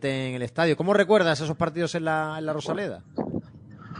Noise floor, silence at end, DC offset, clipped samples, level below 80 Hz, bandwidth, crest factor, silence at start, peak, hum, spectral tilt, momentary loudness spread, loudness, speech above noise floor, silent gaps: -45 dBFS; 0 s; under 0.1%; under 0.1%; -60 dBFS; 10 kHz; 18 dB; 0 s; -8 dBFS; none; -5.5 dB/octave; 12 LU; -25 LUFS; 21 dB; none